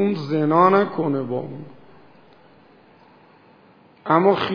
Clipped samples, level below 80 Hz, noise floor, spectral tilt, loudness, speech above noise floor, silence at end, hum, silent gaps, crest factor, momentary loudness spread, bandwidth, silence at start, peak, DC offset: under 0.1%; -68 dBFS; -52 dBFS; -8.5 dB/octave; -19 LUFS; 33 dB; 0 s; none; none; 20 dB; 20 LU; 5.4 kHz; 0 s; -2 dBFS; under 0.1%